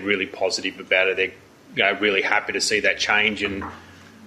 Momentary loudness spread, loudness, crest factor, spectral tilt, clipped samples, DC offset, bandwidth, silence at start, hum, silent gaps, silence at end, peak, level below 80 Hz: 8 LU; -21 LUFS; 18 dB; -2 dB/octave; under 0.1%; under 0.1%; 13.5 kHz; 0 s; none; none; 0 s; -4 dBFS; -56 dBFS